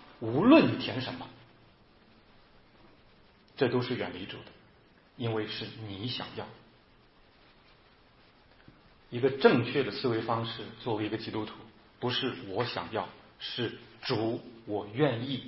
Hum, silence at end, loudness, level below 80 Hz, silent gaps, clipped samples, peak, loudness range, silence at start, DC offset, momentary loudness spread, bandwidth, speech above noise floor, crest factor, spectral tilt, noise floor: none; 0 s; -31 LUFS; -66 dBFS; none; under 0.1%; -8 dBFS; 9 LU; 0.05 s; under 0.1%; 17 LU; 5.8 kHz; 31 dB; 24 dB; -9.5 dB/octave; -61 dBFS